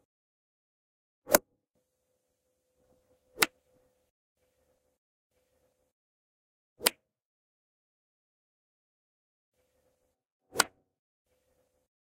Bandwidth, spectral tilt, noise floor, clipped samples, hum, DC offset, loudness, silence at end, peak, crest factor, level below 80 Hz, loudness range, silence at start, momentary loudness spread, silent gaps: 15.5 kHz; -0.5 dB/octave; -80 dBFS; under 0.1%; none; under 0.1%; -29 LUFS; 1.5 s; 0 dBFS; 40 dB; -72 dBFS; 5 LU; 1.3 s; 3 LU; 4.10-4.35 s, 4.98-5.30 s, 5.92-6.76 s, 7.25-9.52 s, 10.32-10.40 s